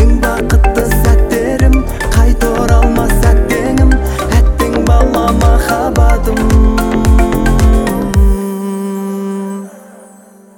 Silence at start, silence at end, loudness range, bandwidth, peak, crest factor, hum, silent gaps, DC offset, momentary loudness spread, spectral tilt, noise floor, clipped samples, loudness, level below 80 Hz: 0 s; 0.8 s; 2 LU; 18 kHz; 0 dBFS; 10 dB; none; none; under 0.1%; 8 LU; -6.5 dB/octave; -39 dBFS; under 0.1%; -12 LUFS; -12 dBFS